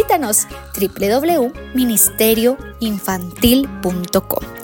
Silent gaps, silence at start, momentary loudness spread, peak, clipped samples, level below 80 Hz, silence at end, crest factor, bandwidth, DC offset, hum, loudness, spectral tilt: none; 0 s; 10 LU; 0 dBFS; under 0.1%; -38 dBFS; 0 s; 16 dB; 17.5 kHz; under 0.1%; none; -16 LUFS; -3.5 dB/octave